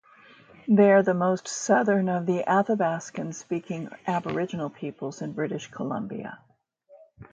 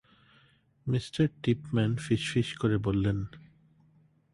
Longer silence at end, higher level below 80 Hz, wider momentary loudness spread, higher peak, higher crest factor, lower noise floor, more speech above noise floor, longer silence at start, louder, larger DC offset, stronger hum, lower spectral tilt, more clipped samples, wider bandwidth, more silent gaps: second, 0.1 s vs 0.95 s; second, -70 dBFS vs -52 dBFS; first, 15 LU vs 6 LU; first, -6 dBFS vs -14 dBFS; about the same, 20 dB vs 18 dB; second, -58 dBFS vs -64 dBFS; second, 32 dB vs 36 dB; second, 0.65 s vs 0.85 s; first, -26 LUFS vs -30 LUFS; neither; neither; about the same, -6 dB/octave vs -6.5 dB/octave; neither; second, 9.2 kHz vs 11.5 kHz; neither